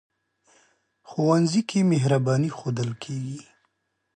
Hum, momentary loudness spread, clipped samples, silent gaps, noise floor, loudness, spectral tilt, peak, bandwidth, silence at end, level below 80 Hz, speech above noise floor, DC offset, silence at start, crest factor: none; 13 LU; under 0.1%; none; -76 dBFS; -24 LUFS; -6.5 dB/octave; -10 dBFS; 9.6 kHz; 0.75 s; -68 dBFS; 53 dB; under 0.1%; 1.1 s; 16 dB